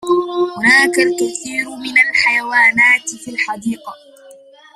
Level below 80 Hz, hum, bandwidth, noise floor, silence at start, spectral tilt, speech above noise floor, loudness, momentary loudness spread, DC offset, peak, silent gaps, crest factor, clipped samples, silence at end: -62 dBFS; none; 14 kHz; -42 dBFS; 0 s; -2 dB/octave; 26 dB; -13 LUFS; 12 LU; under 0.1%; 0 dBFS; none; 16 dB; under 0.1%; 0.4 s